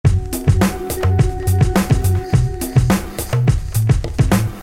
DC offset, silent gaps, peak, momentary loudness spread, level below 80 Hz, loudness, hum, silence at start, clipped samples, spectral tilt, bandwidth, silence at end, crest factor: under 0.1%; none; -2 dBFS; 3 LU; -24 dBFS; -17 LUFS; none; 0.05 s; under 0.1%; -6.5 dB/octave; 16.5 kHz; 0 s; 14 dB